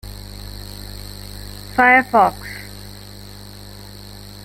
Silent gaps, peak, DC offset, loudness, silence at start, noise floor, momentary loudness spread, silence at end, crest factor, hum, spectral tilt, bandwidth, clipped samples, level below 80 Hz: none; -2 dBFS; under 0.1%; -14 LUFS; 0.05 s; -37 dBFS; 25 LU; 1.55 s; 20 dB; 50 Hz at -35 dBFS; -4.5 dB/octave; 17 kHz; under 0.1%; -40 dBFS